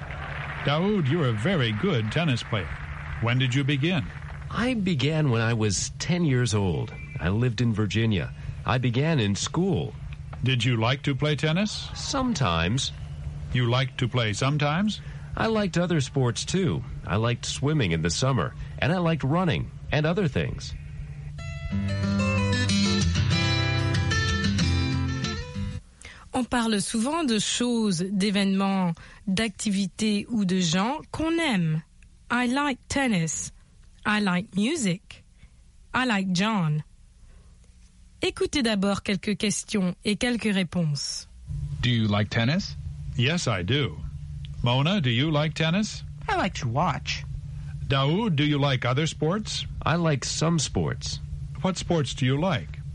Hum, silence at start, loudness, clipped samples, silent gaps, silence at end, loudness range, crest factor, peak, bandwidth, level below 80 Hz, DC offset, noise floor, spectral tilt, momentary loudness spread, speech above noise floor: none; 0 s; -26 LUFS; under 0.1%; none; 0 s; 2 LU; 18 dB; -8 dBFS; 11.5 kHz; -42 dBFS; under 0.1%; -52 dBFS; -5 dB/octave; 10 LU; 27 dB